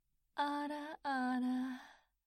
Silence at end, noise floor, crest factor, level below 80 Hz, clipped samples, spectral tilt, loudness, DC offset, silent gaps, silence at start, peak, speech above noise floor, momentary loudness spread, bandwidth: 0.3 s; -60 dBFS; 16 dB; -82 dBFS; under 0.1%; -3.5 dB/octave; -40 LUFS; under 0.1%; none; 0.35 s; -26 dBFS; 22 dB; 9 LU; 13 kHz